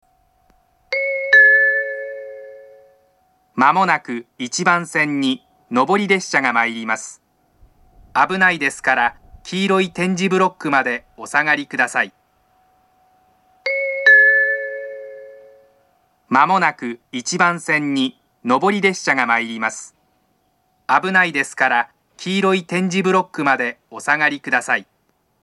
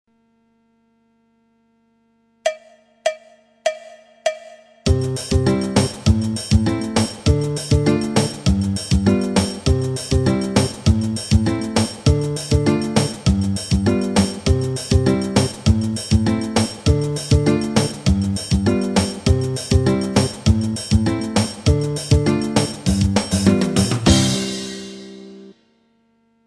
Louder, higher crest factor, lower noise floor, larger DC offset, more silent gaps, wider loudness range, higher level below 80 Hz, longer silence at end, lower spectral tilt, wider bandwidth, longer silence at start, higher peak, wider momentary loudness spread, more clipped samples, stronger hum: about the same, -17 LUFS vs -19 LUFS; about the same, 18 dB vs 16 dB; about the same, -64 dBFS vs -61 dBFS; neither; neither; about the same, 4 LU vs 6 LU; second, -60 dBFS vs -30 dBFS; second, 0.6 s vs 0.95 s; second, -4 dB/octave vs -5.5 dB/octave; second, 12 kHz vs 13.5 kHz; second, 0.9 s vs 2.45 s; about the same, 0 dBFS vs -2 dBFS; first, 14 LU vs 8 LU; neither; second, none vs 50 Hz at -40 dBFS